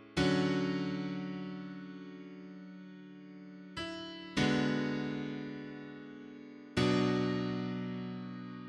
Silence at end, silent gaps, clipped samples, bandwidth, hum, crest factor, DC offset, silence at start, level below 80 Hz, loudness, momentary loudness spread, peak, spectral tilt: 0 s; none; under 0.1%; 11 kHz; none; 20 dB; under 0.1%; 0 s; -62 dBFS; -35 LUFS; 19 LU; -16 dBFS; -6 dB/octave